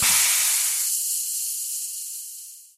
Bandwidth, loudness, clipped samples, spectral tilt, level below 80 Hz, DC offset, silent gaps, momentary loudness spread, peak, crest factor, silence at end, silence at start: 16 kHz; -21 LUFS; under 0.1%; 2.5 dB/octave; -60 dBFS; under 0.1%; none; 16 LU; -6 dBFS; 18 dB; 0.1 s; 0 s